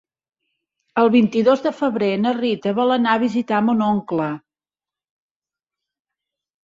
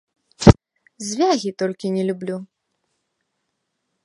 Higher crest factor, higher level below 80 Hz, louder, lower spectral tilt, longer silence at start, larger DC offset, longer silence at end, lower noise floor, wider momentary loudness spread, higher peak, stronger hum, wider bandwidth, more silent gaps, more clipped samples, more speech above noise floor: about the same, 18 dB vs 22 dB; second, -64 dBFS vs -34 dBFS; about the same, -19 LUFS vs -19 LUFS; about the same, -7 dB/octave vs -6 dB/octave; first, 0.95 s vs 0.4 s; neither; first, 2.25 s vs 1.6 s; first, under -90 dBFS vs -75 dBFS; second, 8 LU vs 16 LU; second, -4 dBFS vs 0 dBFS; neither; second, 7.4 kHz vs 11.5 kHz; neither; neither; first, over 72 dB vs 53 dB